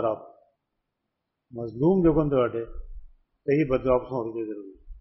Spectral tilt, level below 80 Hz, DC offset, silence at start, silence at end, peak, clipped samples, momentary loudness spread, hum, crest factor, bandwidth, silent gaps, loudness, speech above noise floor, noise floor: -8 dB/octave; -44 dBFS; under 0.1%; 0 s; 0 s; -10 dBFS; under 0.1%; 19 LU; none; 18 dB; 5.8 kHz; none; -25 LUFS; 57 dB; -82 dBFS